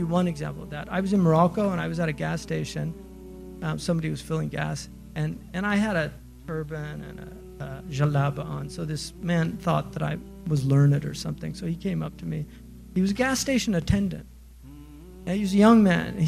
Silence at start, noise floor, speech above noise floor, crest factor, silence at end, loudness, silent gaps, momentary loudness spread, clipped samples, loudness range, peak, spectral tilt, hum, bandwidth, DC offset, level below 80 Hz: 0 s; -46 dBFS; 21 dB; 20 dB; 0 s; -26 LUFS; none; 18 LU; under 0.1%; 5 LU; -6 dBFS; -6.5 dB/octave; none; 15 kHz; under 0.1%; -46 dBFS